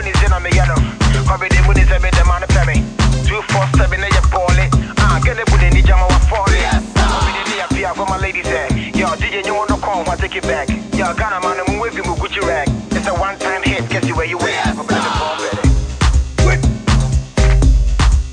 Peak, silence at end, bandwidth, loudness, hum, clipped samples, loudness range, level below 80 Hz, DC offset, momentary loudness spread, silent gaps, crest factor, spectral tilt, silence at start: -2 dBFS; 0 s; 10 kHz; -15 LUFS; none; under 0.1%; 4 LU; -16 dBFS; under 0.1%; 6 LU; none; 12 dB; -5 dB/octave; 0 s